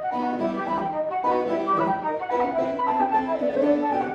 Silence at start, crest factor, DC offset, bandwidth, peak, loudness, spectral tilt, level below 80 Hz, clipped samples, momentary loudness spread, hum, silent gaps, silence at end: 0 s; 14 dB; under 0.1%; 8.2 kHz; -10 dBFS; -24 LUFS; -7.5 dB/octave; -60 dBFS; under 0.1%; 5 LU; none; none; 0 s